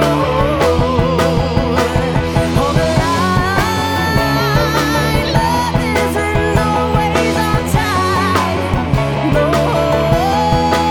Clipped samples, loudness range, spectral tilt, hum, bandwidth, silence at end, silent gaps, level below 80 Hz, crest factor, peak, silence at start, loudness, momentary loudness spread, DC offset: under 0.1%; 0 LU; -5.5 dB/octave; none; over 20 kHz; 0 s; none; -26 dBFS; 14 dB; 0 dBFS; 0 s; -14 LUFS; 2 LU; under 0.1%